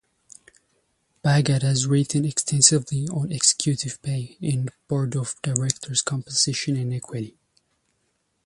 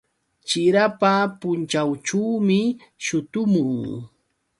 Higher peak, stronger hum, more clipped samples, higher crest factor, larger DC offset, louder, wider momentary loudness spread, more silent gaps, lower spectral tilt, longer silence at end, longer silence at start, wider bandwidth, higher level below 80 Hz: about the same, -2 dBFS vs -4 dBFS; neither; neither; about the same, 22 dB vs 18 dB; neither; about the same, -22 LUFS vs -21 LUFS; about the same, 12 LU vs 10 LU; neither; about the same, -4 dB/octave vs -5 dB/octave; first, 1.15 s vs 0.55 s; first, 1.25 s vs 0.45 s; about the same, 11.5 kHz vs 11.5 kHz; first, -58 dBFS vs -64 dBFS